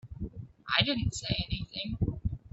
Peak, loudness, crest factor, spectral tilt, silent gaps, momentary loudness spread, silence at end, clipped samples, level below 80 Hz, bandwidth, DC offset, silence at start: -10 dBFS; -31 LUFS; 22 dB; -4.5 dB/octave; none; 15 LU; 0.05 s; under 0.1%; -44 dBFS; 8.2 kHz; under 0.1%; 0.05 s